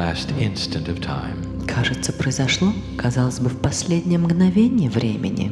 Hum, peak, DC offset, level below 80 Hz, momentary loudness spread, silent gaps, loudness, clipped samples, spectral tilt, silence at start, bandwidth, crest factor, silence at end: none; -6 dBFS; under 0.1%; -40 dBFS; 9 LU; none; -21 LUFS; under 0.1%; -5.5 dB/octave; 0 s; 12 kHz; 14 dB; 0 s